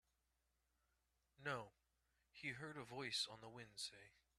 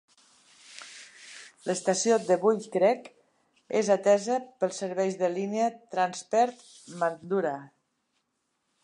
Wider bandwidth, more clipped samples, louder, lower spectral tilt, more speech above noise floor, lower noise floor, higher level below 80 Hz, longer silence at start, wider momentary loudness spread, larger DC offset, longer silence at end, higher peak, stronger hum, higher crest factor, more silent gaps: first, 13 kHz vs 11 kHz; neither; second, -49 LUFS vs -27 LUFS; second, -2.5 dB/octave vs -4 dB/octave; second, 36 dB vs 51 dB; first, -87 dBFS vs -78 dBFS; about the same, -84 dBFS vs -84 dBFS; first, 1.4 s vs 0.7 s; second, 16 LU vs 21 LU; neither; second, 0.3 s vs 1.15 s; second, -30 dBFS vs -10 dBFS; neither; first, 24 dB vs 18 dB; neither